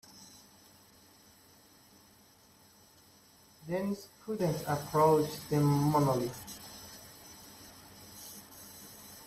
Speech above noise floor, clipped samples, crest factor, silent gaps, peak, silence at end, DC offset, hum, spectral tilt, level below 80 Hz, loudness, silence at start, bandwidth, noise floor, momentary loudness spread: 31 dB; under 0.1%; 22 dB; none; -14 dBFS; 0 s; under 0.1%; none; -6.5 dB/octave; -66 dBFS; -31 LUFS; 0.15 s; 16 kHz; -62 dBFS; 24 LU